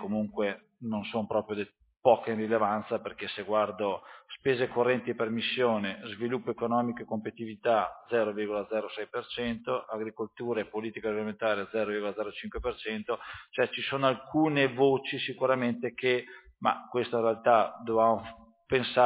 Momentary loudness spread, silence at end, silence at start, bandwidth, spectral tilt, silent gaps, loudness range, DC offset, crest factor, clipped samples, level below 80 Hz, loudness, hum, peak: 11 LU; 0 s; 0 s; 4 kHz; -9 dB/octave; none; 5 LU; under 0.1%; 20 dB; under 0.1%; -60 dBFS; -30 LUFS; none; -8 dBFS